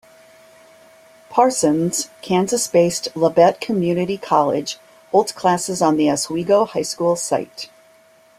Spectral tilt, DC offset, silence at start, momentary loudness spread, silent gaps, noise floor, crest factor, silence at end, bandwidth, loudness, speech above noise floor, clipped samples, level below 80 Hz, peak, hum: -4.5 dB/octave; under 0.1%; 1.3 s; 8 LU; none; -52 dBFS; 18 dB; 0.75 s; 15.5 kHz; -18 LUFS; 34 dB; under 0.1%; -60 dBFS; -2 dBFS; none